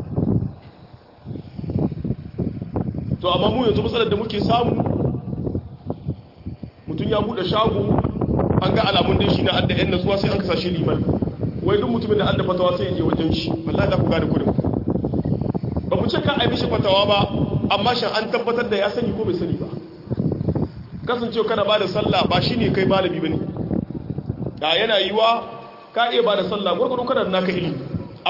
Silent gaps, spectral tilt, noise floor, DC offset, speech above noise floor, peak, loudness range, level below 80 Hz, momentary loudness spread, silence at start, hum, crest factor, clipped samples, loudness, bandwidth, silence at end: none; -7.5 dB/octave; -45 dBFS; under 0.1%; 26 dB; -2 dBFS; 4 LU; -40 dBFS; 11 LU; 0 s; none; 18 dB; under 0.1%; -21 LUFS; 5.8 kHz; 0 s